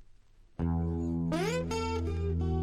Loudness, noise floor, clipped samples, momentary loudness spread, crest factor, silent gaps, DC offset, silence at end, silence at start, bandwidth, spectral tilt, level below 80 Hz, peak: -33 LUFS; -57 dBFS; under 0.1%; 2 LU; 12 dB; none; under 0.1%; 0 s; 0 s; 12.5 kHz; -7 dB/octave; -44 dBFS; -20 dBFS